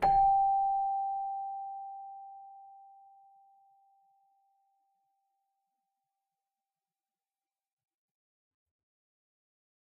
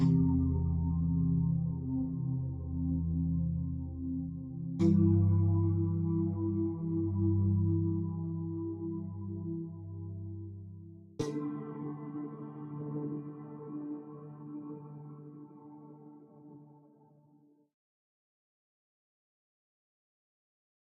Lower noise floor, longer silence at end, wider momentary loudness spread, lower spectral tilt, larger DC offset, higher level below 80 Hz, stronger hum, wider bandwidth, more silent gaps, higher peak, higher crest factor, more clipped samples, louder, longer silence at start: first, under -90 dBFS vs -65 dBFS; first, 7.15 s vs 4.15 s; first, 25 LU vs 19 LU; second, -3.5 dB/octave vs -12 dB/octave; neither; second, -60 dBFS vs -52 dBFS; neither; first, 4.5 kHz vs 4 kHz; neither; about the same, -18 dBFS vs -16 dBFS; about the same, 20 dB vs 18 dB; neither; first, -30 LUFS vs -33 LUFS; about the same, 0 s vs 0 s